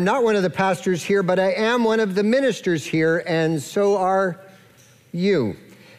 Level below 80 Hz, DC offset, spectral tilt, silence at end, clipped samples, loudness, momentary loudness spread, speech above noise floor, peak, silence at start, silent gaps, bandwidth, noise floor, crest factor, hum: -66 dBFS; under 0.1%; -5.5 dB/octave; 0.4 s; under 0.1%; -20 LUFS; 6 LU; 32 dB; -8 dBFS; 0 s; none; 15 kHz; -52 dBFS; 12 dB; none